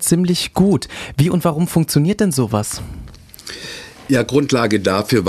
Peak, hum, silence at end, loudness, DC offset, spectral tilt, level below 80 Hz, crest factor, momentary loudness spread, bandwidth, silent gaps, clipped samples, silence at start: -2 dBFS; none; 0 s; -17 LUFS; under 0.1%; -5.5 dB/octave; -42 dBFS; 14 dB; 16 LU; 14 kHz; none; under 0.1%; 0 s